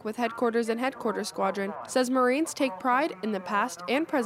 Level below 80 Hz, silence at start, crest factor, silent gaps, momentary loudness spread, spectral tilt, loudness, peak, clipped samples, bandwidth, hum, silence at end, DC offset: -74 dBFS; 0 s; 16 dB; none; 6 LU; -4 dB/octave; -28 LUFS; -12 dBFS; under 0.1%; 16 kHz; none; 0 s; under 0.1%